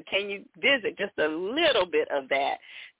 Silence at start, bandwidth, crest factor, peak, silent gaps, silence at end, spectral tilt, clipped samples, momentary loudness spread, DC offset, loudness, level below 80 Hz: 0.05 s; 4 kHz; 14 dB; -12 dBFS; none; 0.15 s; -6.5 dB/octave; under 0.1%; 8 LU; under 0.1%; -26 LUFS; -66 dBFS